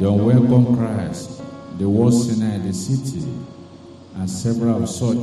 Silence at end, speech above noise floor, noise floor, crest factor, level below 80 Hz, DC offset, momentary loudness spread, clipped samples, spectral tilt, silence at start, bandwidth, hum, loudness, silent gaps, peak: 0 s; 23 dB; -41 dBFS; 16 dB; -50 dBFS; under 0.1%; 18 LU; under 0.1%; -7.5 dB/octave; 0 s; 12.5 kHz; none; -19 LUFS; none; -2 dBFS